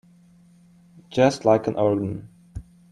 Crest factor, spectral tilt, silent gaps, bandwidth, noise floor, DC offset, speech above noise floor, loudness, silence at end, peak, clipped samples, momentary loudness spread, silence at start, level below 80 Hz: 20 dB; -6.5 dB/octave; none; 11 kHz; -53 dBFS; under 0.1%; 33 dB; -22 LUFS; 0.3 s; -4 dBFS; under 0.1%; 22 LU; 1.1 s; -52 dBFS